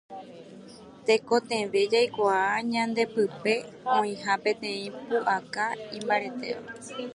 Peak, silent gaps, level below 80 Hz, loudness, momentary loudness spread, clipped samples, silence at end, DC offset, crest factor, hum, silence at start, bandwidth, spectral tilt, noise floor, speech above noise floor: -8 dBFS; none; -70 dBFS; -27 LUFS; 16 LU; under 0.1%; 0 s; under 0.1%; 20 dB; none; 0.1 s; 11 kHz; -4 dB/octave; -47 dBFS; 20 dB